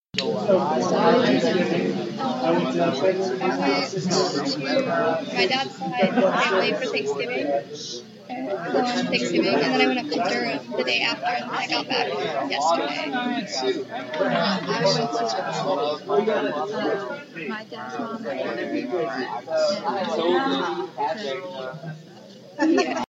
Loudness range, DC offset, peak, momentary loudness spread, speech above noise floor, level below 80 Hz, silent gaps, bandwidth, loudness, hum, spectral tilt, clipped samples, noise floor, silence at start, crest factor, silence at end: 4 LU; under 0.1%; -6 dBFS; 11 LU; 21 dB; -74 dBFS; none; 8 kHz; -24 LUFS; none; -4.5 dB/octave; under 0.1%; -44 dBFS; 0.15 s; 18 dB; 0.05 s